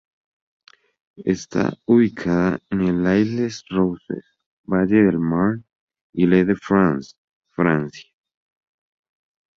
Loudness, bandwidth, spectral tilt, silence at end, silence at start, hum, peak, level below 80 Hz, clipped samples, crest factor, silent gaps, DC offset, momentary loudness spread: -20 LUFS; 7.4 kHz; -7.5 dB/octave; 1.55 s; 1.2 s; none; -2 dBFS; -50 dBFS; under 0.1%; 18 dB; 4.46-4.64 s, 5.75-5.88 s, 6.01-6.13 s, 7.18-7.42 s; under 0.1%; 14 LU